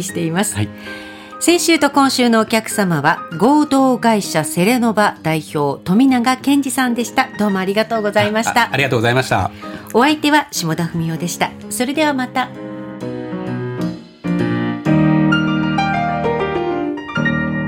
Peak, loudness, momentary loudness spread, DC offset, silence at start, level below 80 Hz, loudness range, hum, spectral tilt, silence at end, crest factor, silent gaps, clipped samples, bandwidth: -2 dBFS; -16 LUFS; 11 LU; under 0.1%; 0 s; -50 dBFS; 6 LU; none; -5 dB/octave; 0 s; 14 dB; none; under 0.1%; 17 kHz